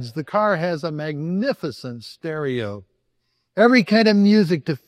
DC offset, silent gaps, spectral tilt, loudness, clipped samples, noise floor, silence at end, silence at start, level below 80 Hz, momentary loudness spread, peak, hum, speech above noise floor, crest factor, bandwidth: under 0.1%; none; -7 dB/octave; -19 LUFS; under 0.1%; -71 dBFS; 0.1 s; 0 s; -68 dBFS; 17 LU; -2 dBFS; none; 52 dB; 18 dB; 10.5 kHz